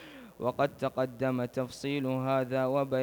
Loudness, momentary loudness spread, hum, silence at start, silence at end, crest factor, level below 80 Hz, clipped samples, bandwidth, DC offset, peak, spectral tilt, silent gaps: -32 LUFS; 6 LU; none; 0 s; 0 s; 16 dB; -66 dBFS; under 0.1%; over 20 kHz; under 0.1%; -14 dBFS; -7 dB/octave; none